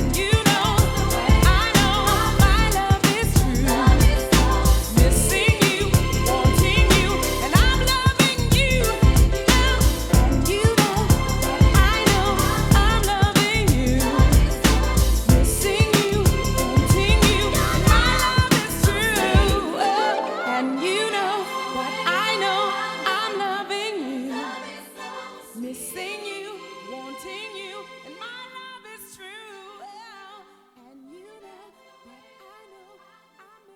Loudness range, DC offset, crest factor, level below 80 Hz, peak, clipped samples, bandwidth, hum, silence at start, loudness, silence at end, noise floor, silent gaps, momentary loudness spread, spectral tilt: 16 LU; under 0.1%; 20 dB; -24 dBFS; 0 dBFS; under 0.1%; 18.5 kHz; none; 0 s; -19 LUFS; 3.4 s; -54 dBFS; none; 18 LU; -4.5 dB/octave